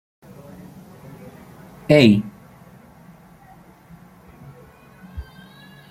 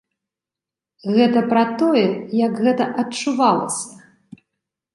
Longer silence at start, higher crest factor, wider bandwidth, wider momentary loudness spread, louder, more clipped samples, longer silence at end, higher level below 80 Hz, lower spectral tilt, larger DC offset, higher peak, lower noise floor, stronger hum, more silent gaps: first, 1.9 s vs 1.05 s; first, 24 dB vs 18 dB; first, 15.5 kHz vs 11.5 kHz; first, 31 LU vs 9 LU; first, -15 LUFS vs -18 LUFS; neither; second, 0.7 s vs 0.95 s; first, -50 dBFS vs -68 dBFS; first, -7 dB/octave vs -5 dB/octave; neither; about the same, -2 dBFS vs -2 dBFS; second, -48 dBFS vs -88 dBFS; neither; neither